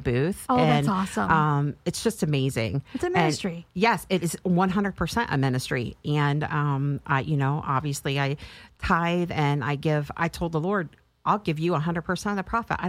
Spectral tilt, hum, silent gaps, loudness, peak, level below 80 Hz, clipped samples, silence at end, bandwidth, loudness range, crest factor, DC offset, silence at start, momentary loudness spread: -6 dB/octave; none; none; -25 LUFS; -6 dBFS; -48 dBFS; under 0.1%; 0 s; 15.5 kHz; 2 LU; 20 dB; under 0.1%; 0 s; 6 LU